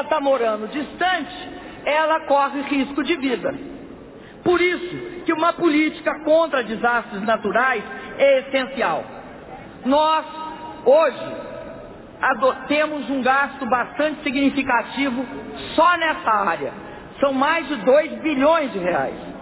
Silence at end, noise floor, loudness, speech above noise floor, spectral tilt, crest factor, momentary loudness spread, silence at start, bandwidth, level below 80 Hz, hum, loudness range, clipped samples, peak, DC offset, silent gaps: 0 s; -40 dBFS; -20 LUFS; 20 dB; -8.5 dB/octave; 16 dB; 15 LU; 0 s; 4 kHz; -52 dBFS; none; 2 LU; under 0.1%; -4 dBFS; under 0.1%; none